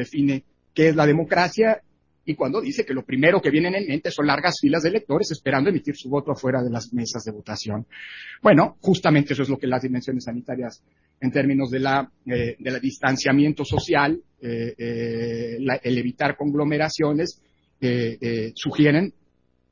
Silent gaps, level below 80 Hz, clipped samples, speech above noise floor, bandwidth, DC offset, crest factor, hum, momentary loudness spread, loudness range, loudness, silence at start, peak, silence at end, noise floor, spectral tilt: none; -52 dBFS; under 0.1%; 43 dB; 7.4 kHz; under 0.1%; 20 dB; none; 11 LU; 4 LU; -22 LUFS; 0 s; -2 dBFS; 0.6 s; -65 dBFS; -6 dB/octave